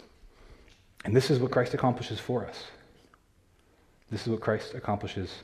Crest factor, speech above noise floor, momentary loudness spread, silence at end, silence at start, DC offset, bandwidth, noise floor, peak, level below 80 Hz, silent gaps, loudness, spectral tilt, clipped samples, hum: 22 dB; 35 dB; 15 LU; 0 s; 0 s; under 0.1%; 14.5 kHz; -64 dBFS; -10 dBFS; -60 dBFS; none; -30 LUFS; -6.5 dB/octave; under 0.1%; none